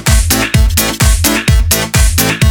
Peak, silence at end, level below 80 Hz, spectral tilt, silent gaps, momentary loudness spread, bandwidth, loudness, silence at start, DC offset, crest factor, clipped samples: 0 dBFS; 0 s; -14 dBFS; -3.5 dB/octave; none; 1 LU; over 20 kHz; -10 LUFS; 0 s; under 0.1%; 10 dB; under 0.1%